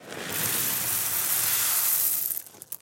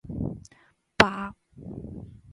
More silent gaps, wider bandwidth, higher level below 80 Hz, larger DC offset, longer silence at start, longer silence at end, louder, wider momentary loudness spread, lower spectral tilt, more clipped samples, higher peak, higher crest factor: neither; first, 17 kHz vs 11.5 kHz; second, -72 dBFS vs -48 dBFS; neither; about the same, 0 s vs 0.05 s; about the same, 0.05 s vs 0 s; about the same, -23 LUFS vs -25 LUFS; second, 9 LU vs 23 LU; second, 0 dB/octave vs -4.5 dB/octave; neither; second, -8 dBFS vs 0 dBFS; second, 20 dB vs 30 dB